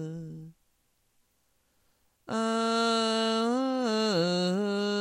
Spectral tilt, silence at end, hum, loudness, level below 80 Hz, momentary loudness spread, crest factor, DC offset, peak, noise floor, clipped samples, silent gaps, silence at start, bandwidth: -4.5 dB/octave; 0 s; none; -28 LUFS; -74 dBFS; 13 LU; 16 dB; under 0.1%; -14 dBFS; -72 dBFS; under 0.1%; none; 0 s; 15.5 kHz